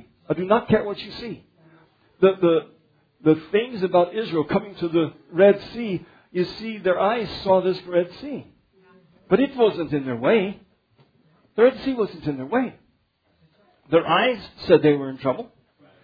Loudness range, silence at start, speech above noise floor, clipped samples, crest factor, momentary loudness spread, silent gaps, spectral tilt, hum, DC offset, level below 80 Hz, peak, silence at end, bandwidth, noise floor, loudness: 3 LU; 0.3 s; 45 dB; under 0.1%; 20 dB; 14 LU; none; -8.5 dB/octave; none; under 0.1%; -58 dBFS; -2 dBFS; 0.6 s; 5 kHz; -66 dBFS; -22 LUFS